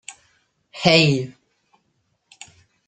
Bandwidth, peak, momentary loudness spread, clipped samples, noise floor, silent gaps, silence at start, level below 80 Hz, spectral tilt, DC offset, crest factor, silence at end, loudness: 9.4 kHz; -2 dBFS; 26 LU; under 0.1%; -69 dBFS; none; 0.1 s; -58 dBFS; -5 dB/octave; under 0.1%; 22 dB; 1.55 s; -17 LUFS